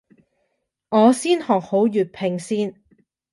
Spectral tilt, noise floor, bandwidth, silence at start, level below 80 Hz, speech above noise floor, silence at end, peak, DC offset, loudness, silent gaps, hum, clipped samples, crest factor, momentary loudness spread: -5.5 dB/octave; -73 dBFS; 11.5 kHz; 0.9 s; -68 dBFS; 54 dB; 0.6 s; -4 dBFS; under 0.1%; -20 LUFS; none; none; under 0.1%; 18 dB; 9 LU